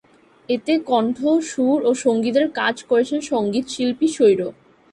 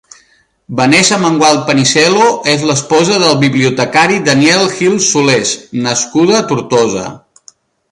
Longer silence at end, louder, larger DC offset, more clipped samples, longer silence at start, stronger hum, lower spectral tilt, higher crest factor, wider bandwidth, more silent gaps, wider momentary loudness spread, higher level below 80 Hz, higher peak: second, 0.4 s vs 0.75 s; second, -20 LUFS vs -10 LUFS; neither; neither; second, 0.5 s vs 0.7 s; neither; about the same, -4.5 dB/octave vs -3.5 dB/octave; about the same, 16 dB vs 12 dB; about the same, 11.5 kHz vs 11.5 kHz; neither; about the same, 6 LU vs 6 LU; second, -62 dBFS vs -52 dBFS; second, -4 dBFS vs 0 dBFS